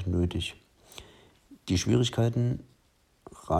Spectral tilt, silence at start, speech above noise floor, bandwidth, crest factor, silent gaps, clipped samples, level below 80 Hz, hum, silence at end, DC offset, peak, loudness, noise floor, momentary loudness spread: -6 dB/octave; 0 s; 39 dB; 12.5 kHz; 18 dB; none; under 0.1%; -50 dBFS; none; 0 s; under 0.1%; -12 dBFS; -28 LUFS; -67 dBFS; 23 LU